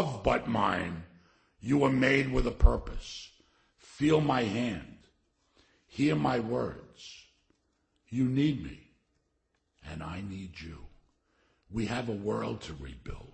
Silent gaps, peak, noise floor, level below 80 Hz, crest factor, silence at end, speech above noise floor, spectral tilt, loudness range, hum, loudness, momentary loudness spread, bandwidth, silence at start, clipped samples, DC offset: none; -8 dBFS; -77 dBFS; -38 dBFS; 24 dB; 0.05 s; 47 dB; -6.5 dB/octave; 9 LU; none; -30 LUFS; 19 LU; 8.8 kHz; 0 s; under 0.1%; under 0.1%